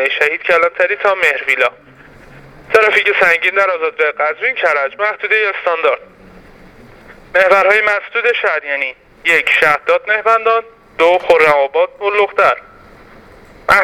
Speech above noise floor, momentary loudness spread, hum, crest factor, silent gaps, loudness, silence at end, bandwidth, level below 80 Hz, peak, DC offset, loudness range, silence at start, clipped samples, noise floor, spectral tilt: 27 dB; 7 LU; none; 14 dB; none; -13 LUFS; 0 s; 17 kHz; -50 dBFS; 0 dBFS; under 0.1%; 3 LU; 0 s; under 0.1%; -40 dBFS; -3 dB/octave